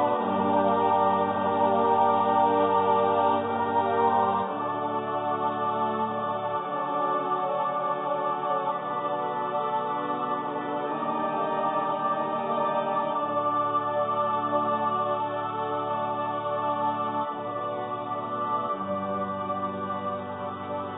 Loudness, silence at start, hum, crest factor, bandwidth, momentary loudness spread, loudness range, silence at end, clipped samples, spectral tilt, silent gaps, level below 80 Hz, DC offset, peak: -27 LUFS; 0 s; none; 16 dB; 4 kHz; 8 LU; 6 LU; 0 s; under 0.1%; -10 dB/octave; none; -64 dBFS; under 0.1%; -12 dBFS